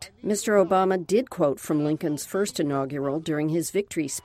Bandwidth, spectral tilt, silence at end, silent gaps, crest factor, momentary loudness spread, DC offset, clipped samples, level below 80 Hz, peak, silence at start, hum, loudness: 16 kHz; -5 dB/octave; 0.05 s; none; 16 dB; 6 LU; under 0.1%; under 0.1%; -62 dBFS; -8 dBFS; 0 s; none; -25 LUFS